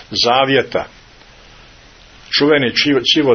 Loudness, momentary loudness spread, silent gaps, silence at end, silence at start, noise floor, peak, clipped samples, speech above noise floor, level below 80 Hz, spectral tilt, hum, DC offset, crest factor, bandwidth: -14 LUFS; 10 LU; none; 0 s; 0 s; -43 dBFS; 0 dBFS; under 0.1%; 29 dB; -48 dBFS; -4 dB/octave; none; under 0.1%; 16 dB; 6.6 kHz